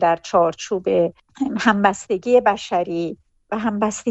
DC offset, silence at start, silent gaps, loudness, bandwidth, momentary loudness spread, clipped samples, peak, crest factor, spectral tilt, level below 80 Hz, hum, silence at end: under 0.1%; 0 s; none; -20 LUFS; 8.4 kHz; 10 LU; under 0.1%; -4 dBFS; 16 dB; -5 dB/octave; -56 dBFS; none; 0 s